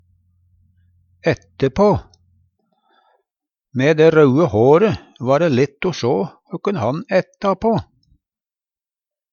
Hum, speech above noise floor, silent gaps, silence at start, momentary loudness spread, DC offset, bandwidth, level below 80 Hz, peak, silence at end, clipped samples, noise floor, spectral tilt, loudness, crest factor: none; over 74 dB; none; 1.25 s; 11 LU; under 0.1%; 7 kHz; -48 dBFS; 0 dBFS; 1.5 s; under 0.1%; under -90 dBFS; -7.5 dB/octave; -17 LUFS; 18 dB